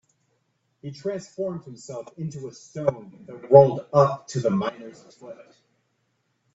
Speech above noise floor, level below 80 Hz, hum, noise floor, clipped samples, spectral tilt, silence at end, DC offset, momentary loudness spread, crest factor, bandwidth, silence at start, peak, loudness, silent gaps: 49 dB; -62 dBFS; none; -72 dBFS; under 0.1%; -7.5 dB/octave; 1.2 s; under 0.1%; 28 LU; 24 dB; 8 kHz; 0.85 s; 0 dBFS; -22 LUFS; none